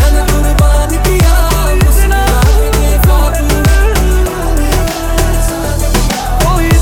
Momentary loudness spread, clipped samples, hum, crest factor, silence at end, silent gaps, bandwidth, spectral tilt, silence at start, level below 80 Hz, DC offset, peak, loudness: 4 LU; under 0.1%; none; 8 dB; 0 s; none; 17.5 kHz; -5 dB/octave; 0 s; -10 dBFS; 0.5%; 0 dBFS; -11 LUFS